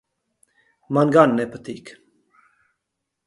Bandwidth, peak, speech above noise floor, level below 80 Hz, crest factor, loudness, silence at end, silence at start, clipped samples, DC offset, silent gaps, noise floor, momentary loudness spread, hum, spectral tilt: 11.5 kHz; -2 dBFS; 61 dB; -66 dBFS; 22 dB; -18 LUFS; 1.35 s; 0.9 s; under 0.1%; under 0.1%; none; -80 dBFS; 21 LU; none; -7.5 dB/octave